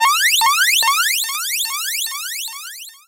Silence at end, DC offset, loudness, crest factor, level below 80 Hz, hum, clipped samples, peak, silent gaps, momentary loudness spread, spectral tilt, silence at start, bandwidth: 0.15 s; under 0.1%; -15 LUFS; 16 dB; -70 dBFS; none; under 0.1%; -2 dBFS; none; 13 LU; 6 dB/octave; 0 s; 17 kHz